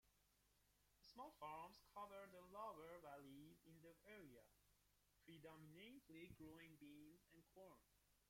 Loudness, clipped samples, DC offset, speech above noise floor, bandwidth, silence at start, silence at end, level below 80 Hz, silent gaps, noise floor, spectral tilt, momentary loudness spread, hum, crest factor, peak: -62 LUFS; under 0.1%; under 0.1%; 21 dB; 16.5 kHz; 0.05 s; 0 s; -84 dBFS; none; -82 dBFS; -5 dB/octave; 11 LU; 50 Hz at -85 dBFS; 20 dB; -44 dBFS